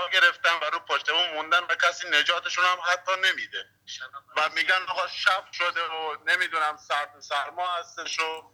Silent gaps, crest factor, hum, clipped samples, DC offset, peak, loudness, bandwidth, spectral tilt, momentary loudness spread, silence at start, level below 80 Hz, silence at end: none; 20 dB; none; under 0.1%; under 0.1%; -6 dBFS; -25 LUFS; 20 kHz; 1 dB/octave; 9 LU; 0 s; -80 dBFS; 0.1 s